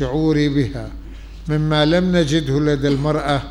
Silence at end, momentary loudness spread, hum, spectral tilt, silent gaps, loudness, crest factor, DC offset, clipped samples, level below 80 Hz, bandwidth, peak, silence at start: 0 s; 17 LU; none; -6.5 dB/octave; none; -18 LUFS; 14 dB; 0.2%; under 0.1%; -34 dBFS; 11 kHz; -4 dBFS; 0 s